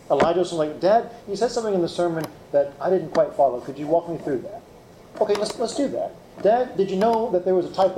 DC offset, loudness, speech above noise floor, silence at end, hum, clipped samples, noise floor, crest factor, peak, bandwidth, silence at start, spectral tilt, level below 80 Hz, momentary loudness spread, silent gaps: under 0.1%; -23 LUFS; 25 dB; 0 s; none; under 0.1%; -47 dBFS; 16 dB; -6 dBFS; 14.5 kHz; 0.1 s; -5.5 dB/octave; -58 dBFS; 10 LU; none